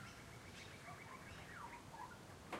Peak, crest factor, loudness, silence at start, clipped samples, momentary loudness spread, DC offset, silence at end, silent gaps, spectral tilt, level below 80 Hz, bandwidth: -34 dBFS; 20 dB; -55 LUFS; 0 s; under 0.1%; 2 LU; under 0.1%; 0 s; none; -4 dB/octave; -70 dBFS; 16 kHz